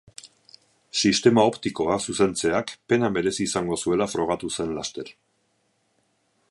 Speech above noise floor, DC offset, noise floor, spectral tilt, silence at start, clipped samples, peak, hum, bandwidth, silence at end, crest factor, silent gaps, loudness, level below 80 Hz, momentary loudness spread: 46 dB; under 0.1%; -69 dBFS; -4 dB/octave; 0.25 s; under 0.1%; -4 dBFS; none; 11.5 kHz; 1.4 s; 20 dB; none; -23 LUFS; -56 dBFS; 13 LU